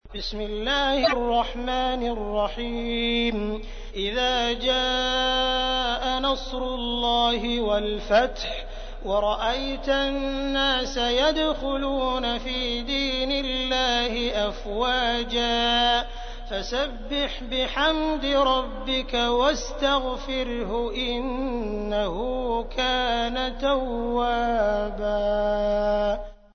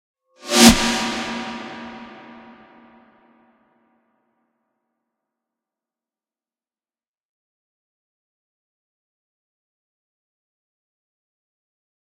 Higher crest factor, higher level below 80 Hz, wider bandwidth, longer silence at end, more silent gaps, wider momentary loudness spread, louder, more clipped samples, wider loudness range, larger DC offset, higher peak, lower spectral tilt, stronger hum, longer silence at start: second, 18 dB vs 26 dB; first, -36 dBFS vs -44 dBFS; second, 6.6 kHz vs 16 kHz; second, 0.2 s vs 9.85 s; neither; second, 7 LU vs 28 LU; second, -24 LUFS vs -16 LUFS; neither; second, 2 LU vs 24 LU; neither; second, -6 dBFS vs 0 dBFS; about the same, -3.5 dB/octave vs -2.5 dB/octave; neither; second, 0.05 s vs 0.45 s